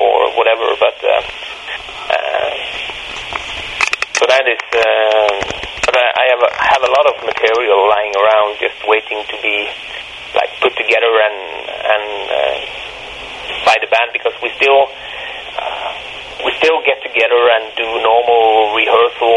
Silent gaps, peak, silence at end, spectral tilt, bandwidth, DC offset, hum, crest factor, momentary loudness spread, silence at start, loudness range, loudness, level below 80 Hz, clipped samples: none; 0 dBFS; 0 s; -1.5 dB/octave; 11.5 kHz; under 0.1%; none; 14 dB; 13 LU; 0 s; 4 LU; -14 LUFS; -46 dBFS; under 0.1%